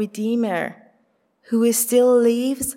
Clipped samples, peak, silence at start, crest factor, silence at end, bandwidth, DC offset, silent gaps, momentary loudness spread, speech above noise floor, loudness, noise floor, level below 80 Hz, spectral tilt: under 0.1%; -6 dBFS; 0 s; 14 dB; 0.05 s; 16.5 kHz; under 0.1%; none; 10 LU; 45 dB; -19 LUFS; -64 dBFS; -58 dBFS; -4 dB/octave